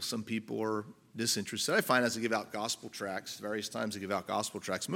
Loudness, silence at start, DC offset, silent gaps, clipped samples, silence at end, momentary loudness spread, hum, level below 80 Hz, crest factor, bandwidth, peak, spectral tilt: -34 LUFS; 0 s; under 0.1%; none; under 0.1%; 0 s; 10 LU; none; -78 dBFS; 22 dB; 17 kHz; -12 dBFS; -3 dB/octave